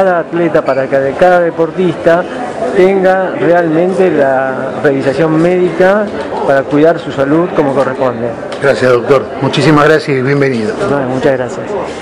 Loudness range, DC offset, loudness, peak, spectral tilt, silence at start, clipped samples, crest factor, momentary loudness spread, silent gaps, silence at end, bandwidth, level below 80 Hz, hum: 1 LU; under 0.1%; -11 LUFS; 0 dBFS; -7 dB/octave; 0 s; 1%; 10 dB; 6 LU; none; 0 s; 11 kHz; -44 dBFS; none